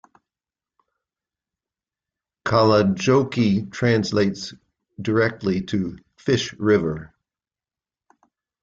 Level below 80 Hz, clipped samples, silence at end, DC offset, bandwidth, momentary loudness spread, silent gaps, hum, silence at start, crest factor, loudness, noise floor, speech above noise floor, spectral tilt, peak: -56 dBFS; under 0.1%; 1.55 s; under 0.1%; 7.8 kHz; 14 LU; none; none; 2.45 s; 18 dB; -21 LUFS; under -90 dBFS; over 70 dB; -6 dB/octave; -4 dBFS